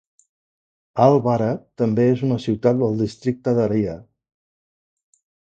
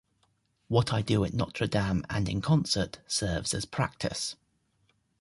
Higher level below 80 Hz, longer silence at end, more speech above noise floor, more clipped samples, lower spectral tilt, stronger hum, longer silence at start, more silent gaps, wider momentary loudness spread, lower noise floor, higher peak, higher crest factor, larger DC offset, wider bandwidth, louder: second, -54 dBFS vs -48 dBFS; first, 1.5 s vs 0.85 s; first, over 71 dB vs 43 dB; neither; first, -8.5 dB/octave vs -5 dB/octave; neither; first, 0.95 s vs 0.7 s; neither; first, 9 LU vs 6 LU; first, under -90 dBFS vs -72 dBFS; first, 0 dBFS vs -10 dBFS; about the same, 20 dB vs 20 dB; neither; second, 8.2 kHz vs 11.5 kHz; first, -20 LUFS vs -29 LUFS